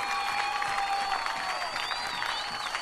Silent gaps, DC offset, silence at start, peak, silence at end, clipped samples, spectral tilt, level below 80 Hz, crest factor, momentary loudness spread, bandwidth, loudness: none; under 0.1%; 0 s; -14 dBFS; 0 s; under 0.1%; -0.5 dB/octave; -58 dBFS; 16 dB; 2 LU; 15 kHz; -30 LUFS